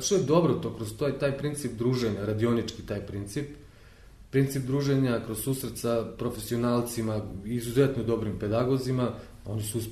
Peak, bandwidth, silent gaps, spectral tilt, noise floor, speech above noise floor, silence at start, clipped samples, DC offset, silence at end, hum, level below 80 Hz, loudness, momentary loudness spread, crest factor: -10 dBFS; 13.5 kHz; none; -6 dB/octave; -51 dBFS; 23 dB; 0 s; under 0.1%; under 0.1%; 0 s; none; -50 dBFS; -29 LUFS; 9 LU; 18 dB